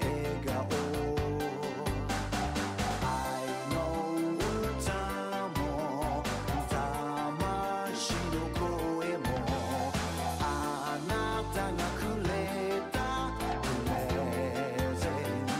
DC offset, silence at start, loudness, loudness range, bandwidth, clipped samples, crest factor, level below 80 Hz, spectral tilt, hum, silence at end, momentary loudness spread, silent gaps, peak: under 0.1%; 0 s; -33 LUFS; 0 LU; 16 kHz; under 0.1%; 12 dB; -44 dBFS; -5 dB/octave; none; 0 s; 2 LU; none; -20 dBFS